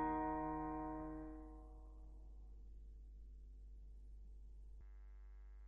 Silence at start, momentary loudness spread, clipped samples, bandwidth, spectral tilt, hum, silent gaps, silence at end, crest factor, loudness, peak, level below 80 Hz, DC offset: 0 s; 17 LU; under 0.1%; 3.6 kHz; -10 dB/octave; none; none; 0 s; 18 dB; -51 LUFS; -30 dBFS; -56 dBFS; under 0.1%